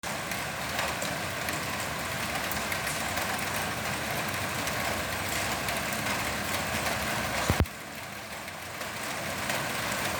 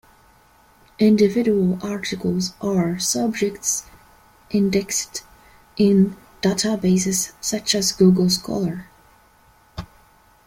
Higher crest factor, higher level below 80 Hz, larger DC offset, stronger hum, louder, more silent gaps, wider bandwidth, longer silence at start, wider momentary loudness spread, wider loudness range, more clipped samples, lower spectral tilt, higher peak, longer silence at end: first, 26 dB vs 18 dB; about the same, -48 dBFS vs -52 dBFS; neither; neither; second, -30 LUFS vs -20 LUFS; neither; first, over 20 kHz vs 16.5 kHz; second, 0.05 s vs 1 s; second, 6 LU vs 12 LU; about the same, 2 LU vs 4 LU; neither; second, -3 dB/octave vs -4.5 dB/octave; about the same, -6 dBFS vs -4 dBFS; second, 0 s vs 0.6 s